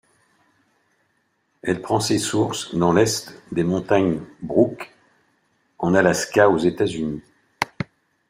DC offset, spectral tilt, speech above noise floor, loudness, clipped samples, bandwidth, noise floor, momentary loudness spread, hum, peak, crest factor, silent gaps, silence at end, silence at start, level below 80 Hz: under 0.1%; -5 dB/octave; 48 dB; -21 LUFS; under 0.1%; 16 kHz; -68 dBFS; 12 LU; none; -2 dBFS; 20 dB; none; 0.45 s; 1.65 s; -56 dBFS